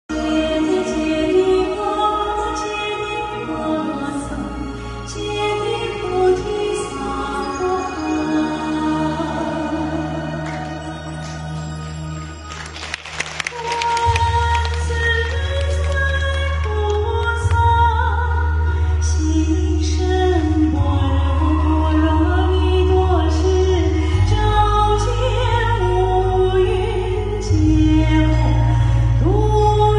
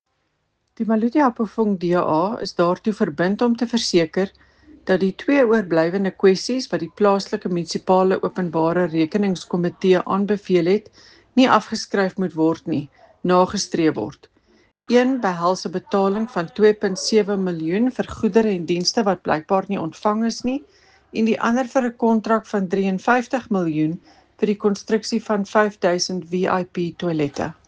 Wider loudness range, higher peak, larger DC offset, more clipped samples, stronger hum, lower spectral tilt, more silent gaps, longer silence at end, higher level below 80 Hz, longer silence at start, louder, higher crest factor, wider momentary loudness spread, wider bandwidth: first, 7 LU vs 2 LU; second, -4 dBFS vs 0 dBFS; neither; neither; neither; about the same, -6.5 dB/octave vs -5.5 dB/octave; neither; second, 0 s vs 0.15 s; first, -22 dBFS vs -58 dBFS; second, 0.1 s vs 0.8 s; about the same, -19 LUFS vs -20 LUFS; second, 14 dB vs 20 dB; first, 11 LU vs 7 LU; about the same, 10.5 kHz vs 9.6 kHz